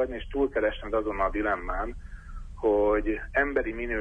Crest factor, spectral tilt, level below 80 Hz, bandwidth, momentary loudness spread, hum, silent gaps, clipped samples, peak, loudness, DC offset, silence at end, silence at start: 16 dB; -7.5 dB/octave; -38 dBFS; 8.2 kHz; 16 LU; none; none; under 0.1%; -12 dBFS; -28 LUFS; under 0.1%; 0 s; 0 s